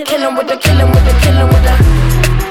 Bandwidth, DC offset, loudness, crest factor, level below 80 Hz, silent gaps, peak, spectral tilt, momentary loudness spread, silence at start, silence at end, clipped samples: 17 kHz; under 0.1%; -10 LUFS; 8 dB; -12 dBFS; none; 0 dBFS; -5.5 dB/octave; 5 LU; 0 s; 0 s; under 0.1%